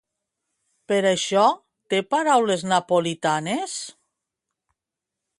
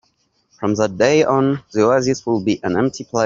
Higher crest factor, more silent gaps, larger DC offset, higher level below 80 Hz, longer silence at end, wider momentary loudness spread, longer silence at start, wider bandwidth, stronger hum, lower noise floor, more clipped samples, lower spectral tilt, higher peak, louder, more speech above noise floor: about the same, 18 dB vs 16 dB; neither; neither; second, -72 dBFS vs -54 dBFS; first, 1.5 s vs 0 s; first, 11 LU vs 6 LU; first, 0.9 s vs 0.6 s; first, 11.5 kHz vs 7.6 kHz; neither; first, -86 dBFS vs -64 dBFS; neither; second, -4 dB/octave vs -5.5 dB/octave; second, -6 dBFS vs -2 dBFS; second, -22 LUFS vs -17 LUFS; first, 65 dB vs 47 dB